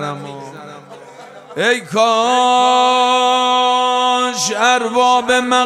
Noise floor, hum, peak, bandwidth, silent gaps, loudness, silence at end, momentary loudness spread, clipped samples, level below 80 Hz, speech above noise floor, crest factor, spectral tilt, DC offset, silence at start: -37 dBFS; none; 0 dBFS; 13.5 kHz; none; -13 LUFS; 0 s; 18 LU; under 0.1%; -64 dBFS; 23 dB; 14 dB; -2 dB/octave; under 0.1%; 0 s